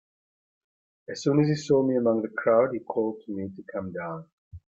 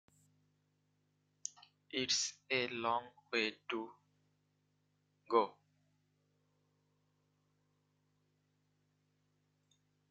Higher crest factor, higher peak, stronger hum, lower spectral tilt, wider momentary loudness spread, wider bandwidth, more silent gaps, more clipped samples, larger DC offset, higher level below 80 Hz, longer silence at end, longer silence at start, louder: second, 18 dB vs 28 dB; first, -10 dBFS vs -16 dBFS; second, none vs 50 Hz at -90 dBFS; first, -7 dB/octave vs -1.5 dB/octave; about the same, 13 LU vs 14 LU; about the same, 8 kHz vs 8.8 kHz; first, 4.32-4.51 s vs none; neither; neither; first, -66 dBFS vs -86 dBFS; second, 0.15 s vs 4.6 s; second, 1.1 s vs 1.45 s; first, -26 LUFS vs -37 LUFS